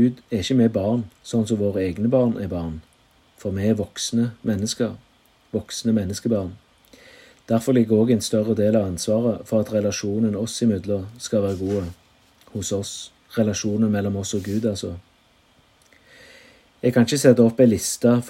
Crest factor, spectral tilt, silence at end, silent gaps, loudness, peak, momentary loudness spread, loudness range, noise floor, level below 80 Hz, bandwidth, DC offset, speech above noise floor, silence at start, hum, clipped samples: 22 dB; -6 dB/octave; 0 s; none; -22 LUFS; 0 dBFS; 12 LU; 5 LU; -58 dBFS; -56 dBFS; 16 kHz; under 0.1%; 37 dB; 0 s; none; under 0.1%